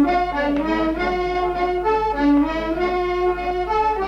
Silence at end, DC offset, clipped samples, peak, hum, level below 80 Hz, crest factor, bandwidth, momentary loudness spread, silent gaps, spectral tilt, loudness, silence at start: 0 s; under 0.1%; under 0.1%; -8 dBFS; none; -36 dBFS; 12 dB; 7.4 kHz; 4 LU; none; -6.5 dB/octave; -20 LUFS; 0 s